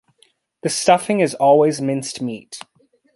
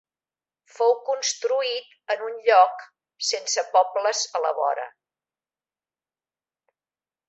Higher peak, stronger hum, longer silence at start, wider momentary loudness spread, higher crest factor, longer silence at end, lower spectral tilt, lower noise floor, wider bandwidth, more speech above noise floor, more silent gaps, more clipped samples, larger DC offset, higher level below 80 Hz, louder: about the same, -2 dBFS vs -4 dBFS; neither; second, 0.65 s vs 0.8 s; first, 18 LU vs 11 LU; about the same, 18 dB vs 22 dB; second, 0.55 s vs 2.4 s; first, -4.5 dB/octave vs 3 dB/octave; second, -59 dBFS vs under -90 dBFS; first, 12 kHz vs 8.2 kHz; second, 42 dB vs over 67 dB; neither; neither; neither; first, -64 dBFS vs -84 dBFS; first, -18 LUFS vs -23 LUFS